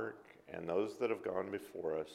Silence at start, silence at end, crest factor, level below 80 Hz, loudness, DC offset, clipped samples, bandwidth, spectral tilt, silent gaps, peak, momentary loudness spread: 0 s; 0 s; 18 dB; -76 dBFS; -40 LUFS; under 0.1%; under 0.1%; 14.5 kHz; -6 dB/octave; none; -22 dBFS; 10 LU